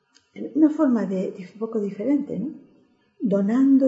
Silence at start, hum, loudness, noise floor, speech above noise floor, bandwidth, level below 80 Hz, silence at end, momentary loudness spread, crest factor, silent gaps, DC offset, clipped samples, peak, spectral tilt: 0.35 s; none; -23 LUFS; -60 dBFS; 38 dB; 7.8 kHz; -76 dBFS; 0 s; 13 LU; 16 dB; none; under 0.1%; under 0.1%; -6 dBFS; -9.5 dB/octave